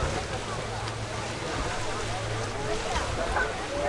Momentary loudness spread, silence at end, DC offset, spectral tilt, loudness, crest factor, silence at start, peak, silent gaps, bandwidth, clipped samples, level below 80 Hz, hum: 4 LU; 0 s; under 0.1%; -4 dB/octave; -31 LUFS; 16 dB; 0 s; -14 dBFS; none; 11.5 kHz; under 0.1%; -40 dBFS; none